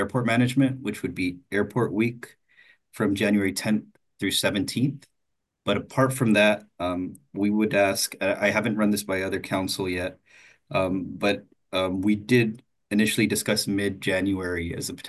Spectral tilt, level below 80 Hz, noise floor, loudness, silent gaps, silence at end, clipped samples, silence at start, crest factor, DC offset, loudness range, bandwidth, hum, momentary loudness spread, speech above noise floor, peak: -5 dB/octave; -52 dBFS; -79 dBFS; -25 LUFS; none; 0 s; under 0.1%; 0 s; 18 dB; under 0.1%; 3 LU; 13 kHz; none; 9 LU; 54 dB; -6 dBFS